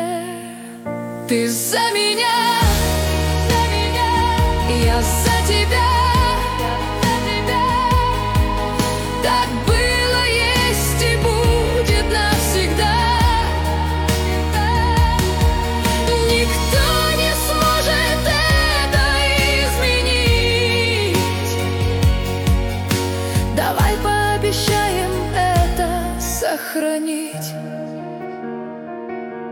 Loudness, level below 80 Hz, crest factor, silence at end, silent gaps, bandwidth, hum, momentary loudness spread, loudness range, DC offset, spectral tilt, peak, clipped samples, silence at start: -17 LUFS; -24 dBFS; 14 dB; 0 s; none; 18.5 kHz; none; 9 LU; 3 LU; under 0.1%; -4 dB/octave; -4 dBFS; under 0.1%; 0 s